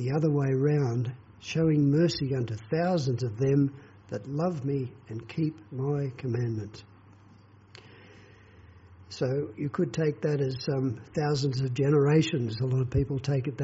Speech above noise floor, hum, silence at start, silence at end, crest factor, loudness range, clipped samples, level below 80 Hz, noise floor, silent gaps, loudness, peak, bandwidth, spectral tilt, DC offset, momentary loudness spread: 28 dB; none; 0 s; 0 s; 16 dB; 9 LU; under 0.1%; -54 dBFS; -55 dBFS; none; -28 LUFS; -12 dBFS; 8 kHz; -7.5 dB/octave; under 0.1%; 10 LU